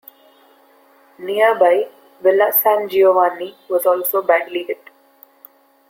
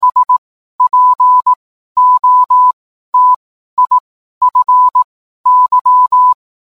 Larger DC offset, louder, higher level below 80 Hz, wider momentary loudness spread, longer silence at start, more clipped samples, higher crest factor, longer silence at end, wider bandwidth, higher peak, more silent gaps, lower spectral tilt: second, under 0.1% vs 0.3%; second, -16 LUFS vs -10 LUFS; second, -72 dBFS vs -62 dBFS; first, 15 LU vs 9 LU; first, 1.2 s vs 0 s; neither; first, 16 dB vs 8 dB; first, 1.15 s vs 0.35 s; first, 17 kHz vs 1.5 kHz; about the same, -2 dBFS vs -2 dBFS; second, none vs 0.38-0.79 s, 1.56-1.95 s, 2.73-3.13 s, 3.36-3.77 s, 4.00-4.41 s, 5.04-5.44 s, 5.81-5.85 s; first, -3 dB/octave vs -1.5 dB/octave